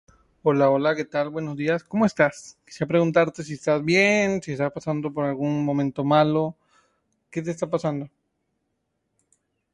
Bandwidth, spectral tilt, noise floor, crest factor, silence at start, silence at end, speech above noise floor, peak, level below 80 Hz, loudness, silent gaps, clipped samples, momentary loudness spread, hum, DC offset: 11.5 kHz; -6 dB/octave; -76 dBFS; 18 dB; 0.45 s; 1.65 s; 53 dB; -6 dBFS; -62 dBFS; -23 LUFS; none; under 0.1%; 11 LU; none; under 0.1%